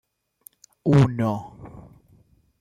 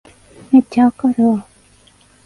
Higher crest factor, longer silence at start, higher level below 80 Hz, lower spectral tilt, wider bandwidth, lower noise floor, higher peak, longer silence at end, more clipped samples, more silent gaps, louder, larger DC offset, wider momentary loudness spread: about the same, 18 dB vs 16 dB; first, 0.85 s vs 0.5 s; about the same, -52 dBFS vs -56 dBFS; about the same, -8.5 dB/octave vs -7.5 dB/octave; first, 14 kHz vs 11 kHz; first, -58 dBFS vs -50 dBFS; second, -6 dBFS vs 0 dBFS; about the same, 0.8 s vs 0.85 s; neither; neither; second, -22 LUFS vs -15 LUFS; neither; first, 25 LU vs 4 LU